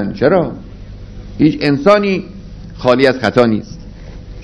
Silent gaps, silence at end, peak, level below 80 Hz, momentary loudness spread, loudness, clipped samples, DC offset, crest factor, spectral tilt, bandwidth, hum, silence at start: none; 0 s; 0 dBFS; -36 dBFS; 23 LU; -13 LUFS; 0.4%; under 0.1%; 14 dB; -7 dB/octave; 11 kHz; none; 0 s